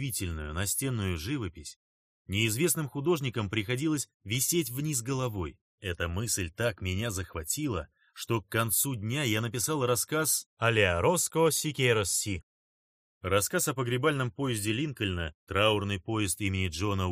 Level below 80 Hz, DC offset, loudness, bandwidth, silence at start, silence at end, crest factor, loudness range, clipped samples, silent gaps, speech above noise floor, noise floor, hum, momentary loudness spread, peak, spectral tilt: -52 dBFS; under 0.1%; -29 LUFS; 15.5 kHz; 0 s; 0 s; 22 dB; 4 LU; under 0.1%; 1.76-2.25 s, 4.14-4.20 s, 5.61-5.78 s, 10.46-10.57 s, 12.43-13.21 s, 15.34-15.47 s; over 60 dB; under -90 dBFS; none; 9 LU; -8 dBFS; -4 dB/octave